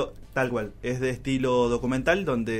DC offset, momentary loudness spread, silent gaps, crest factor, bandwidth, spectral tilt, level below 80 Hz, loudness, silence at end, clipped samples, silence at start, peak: under 0.1%; 7 LU; none; 18 dB; 15.5 kHz; -6 dB/octave; -44 dBFS; -26 LUFS; 0 s; under 0.1%; 0 s; -8 dBFS